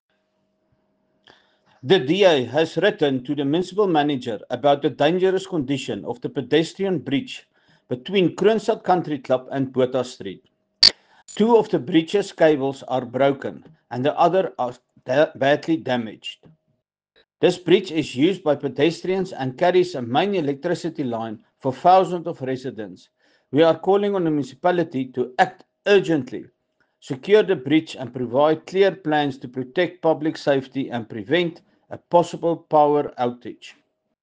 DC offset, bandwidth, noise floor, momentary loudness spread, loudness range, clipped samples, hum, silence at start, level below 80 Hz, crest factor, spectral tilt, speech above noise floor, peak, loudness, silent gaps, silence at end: under 0.1%; 9.4 kHz; -72 dBFS; 13 LU; 3 LU; under 0.1%; none; 1.85 s; -64 dBFS; 22 dB; -5.5 dB/octave; 52 dB; 0 dBFS; -21 LUFS; none; 0.5 s